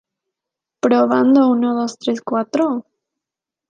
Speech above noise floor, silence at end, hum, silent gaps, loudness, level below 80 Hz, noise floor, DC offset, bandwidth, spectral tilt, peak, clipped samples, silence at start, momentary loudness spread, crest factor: 71 dB; 0.9 s; none; none; -17 LUFS; -72 dBFS; -86 dBFS; under 0.1%; 7.6 kHz; -5.5 dB/octave; -2 dBFS; under 0.1%; 0.85 s; 9 LU; 16 dB